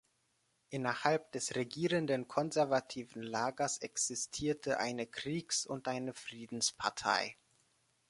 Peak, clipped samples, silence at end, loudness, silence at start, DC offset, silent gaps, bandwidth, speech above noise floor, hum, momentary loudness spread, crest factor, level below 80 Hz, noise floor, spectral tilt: -12 dBFS; under 0.1%; 0.75 s; -36 LUFS; 0.7 s; under 0.1%; none; 11.5 kHz; 41 dB; none; 8 LU; 24 dB; -72 dBFS; -78 dBFS; -3 dB/octave